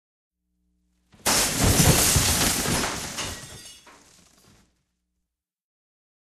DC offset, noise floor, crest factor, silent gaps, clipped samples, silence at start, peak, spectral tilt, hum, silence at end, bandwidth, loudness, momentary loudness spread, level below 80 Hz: under 0.1%; -82 dBFS; 22 dB; none; under 0.1%; 1.25 s; -4 dBFS; -2.5 dB/octave; none; 2.55 s; 14 kHz; -21 LUFS; 18 LU; -38 dBFS